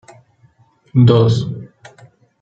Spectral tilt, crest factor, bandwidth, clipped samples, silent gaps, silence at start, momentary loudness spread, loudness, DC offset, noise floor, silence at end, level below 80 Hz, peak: -8.5 dB/octave; 16 dB; 7.6 kHz; under 0.1%; none; 0.95 s; 16 LU; -14 LUFS; under 0.1%; -53 dBFS; 0.75 s; -52 dBFS; 0 dBFS